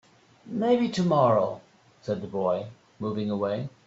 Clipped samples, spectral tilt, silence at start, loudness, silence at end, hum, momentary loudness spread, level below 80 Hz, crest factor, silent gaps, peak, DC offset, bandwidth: under 0.1%; -7.5 dB/octave; 0.45 s; -27 LUFS; 0.2 s; none; 14 LU; -66 dBFS; 16 dB; none; -10 dBFS; under 0.1%; 8 kHz